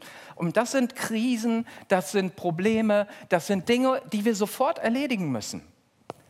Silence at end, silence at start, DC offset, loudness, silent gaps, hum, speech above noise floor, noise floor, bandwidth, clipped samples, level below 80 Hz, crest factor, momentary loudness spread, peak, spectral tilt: 0.15 s; 0 s; under 0.1%; -26 LUFS; none; none; 21 dB; -46 dBFS; 15.5 kHz; under 0.1%; -70 dBFS; 20 dB; 8 LU; -6 dBFS; -5 dB/octave